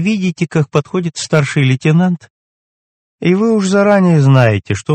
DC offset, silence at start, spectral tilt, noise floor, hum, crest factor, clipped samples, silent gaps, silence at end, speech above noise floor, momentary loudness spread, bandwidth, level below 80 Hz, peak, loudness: under 0.1%; 0 s; -6.5 dB/octave; under -90 dBFS; none; 12 dB; 0.2%; 2.30-3.18 s; 0 s; over 78 dB; 8 LU; 8.8 kHz; -52 dBFS; 0 dBFS; -13 LUFS